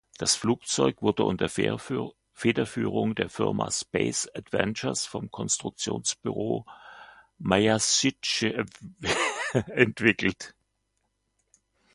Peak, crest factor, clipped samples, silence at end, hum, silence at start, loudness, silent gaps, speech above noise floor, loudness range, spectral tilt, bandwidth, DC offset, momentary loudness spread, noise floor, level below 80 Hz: -2 dBFS; 26 dB; under 0.1%; 1.45 s; none; 0.2 s; -27 LUFS; none; 49 dB; 4 LU; -3.5 dB/octave; 11.5 kHz; under 0.1%; 11 LU; -76 dBFS; -56 dBFS